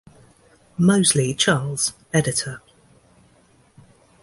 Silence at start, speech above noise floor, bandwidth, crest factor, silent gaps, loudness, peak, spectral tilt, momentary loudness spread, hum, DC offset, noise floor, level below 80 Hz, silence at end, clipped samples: 0.8 s; 37 dB; 11.5 kHz; 20 dB; none; -20 LUFS; -4 dBFS; -4 dB/octave; 15 LU; none; under 0.1%; -56 dBFS; -54 dBFS; 1.65 s; under 0.1%